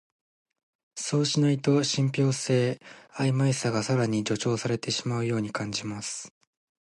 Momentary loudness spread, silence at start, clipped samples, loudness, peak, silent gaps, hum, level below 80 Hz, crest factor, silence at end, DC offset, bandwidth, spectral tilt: 11 LU; 0.95 s; under 0.1%; -27 LUFS; -10 dBFS; none; none; -66 dBFS; 16 dB; 0.65 s; under 0.1%; 11.5 kHz; -5 dB/octave